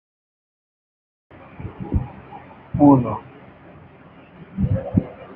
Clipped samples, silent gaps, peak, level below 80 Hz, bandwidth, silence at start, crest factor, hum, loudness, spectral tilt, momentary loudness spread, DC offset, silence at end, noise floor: under 0.1%; none; -2 dBFS; -40 dBFS; 3.4 kHz; 1.6 s; 22 dB; none; -20 LUFS; -12.5 dB/octave; 24 LU; under 0.1%; 0 s; -46 dBFS